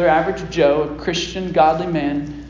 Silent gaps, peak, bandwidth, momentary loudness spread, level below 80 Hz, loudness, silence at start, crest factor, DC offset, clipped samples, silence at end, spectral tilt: none; -2 dBFS; 7.6 kHz; 7 LU; -40 dBFS; -18 LUFS; 0 s; 16 dB; under 0.1%; under 0.1%; 0 s; -5.5 dB/octave